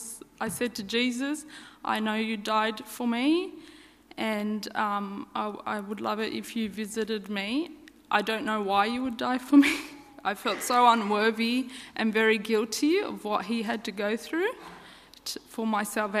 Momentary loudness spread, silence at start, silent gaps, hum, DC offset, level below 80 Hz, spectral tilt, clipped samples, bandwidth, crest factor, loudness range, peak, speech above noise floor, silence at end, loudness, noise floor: 13 LU; 0 s; none; none; under 0.1%; -66 dBFS; -4 dB/octave; under 0.1%; 15.5 kHz; 20 dB; 7 LU; -8 dBFS; 23 dB; 0 s; -28 LUFS; -51 dBFS